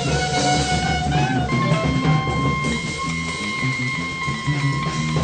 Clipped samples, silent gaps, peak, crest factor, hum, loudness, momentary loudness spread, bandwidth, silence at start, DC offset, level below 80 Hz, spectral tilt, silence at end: under 0.1%; none; -8 dBFS; 14 dB; none; -21 LUFS; 5 LU; 9.4 kHz; 0 s; under 0.1%; -36 dBFS; -5 dB/octave; 0 s